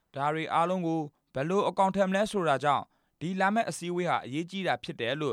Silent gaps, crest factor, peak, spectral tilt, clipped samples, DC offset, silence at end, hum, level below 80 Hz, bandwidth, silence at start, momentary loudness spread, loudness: none; 16 dB; -12 dBFS; -5.5 dB/octave; under 0.1%; under 0.1%; 0 s; none; -68 dBFS; 14.5 kHz; 0.15 s; 8 LU; -29 LUFS